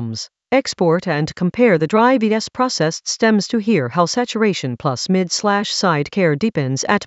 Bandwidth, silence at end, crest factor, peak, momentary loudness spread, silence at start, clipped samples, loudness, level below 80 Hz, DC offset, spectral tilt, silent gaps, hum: 8.2 kHz; 0 s; 18 dB; 0 dBFS; 6 LU; 0 s; under 0.1%; -17 LUFS; -56 dBFS; under 0.1%; -5 dB/octave; none; none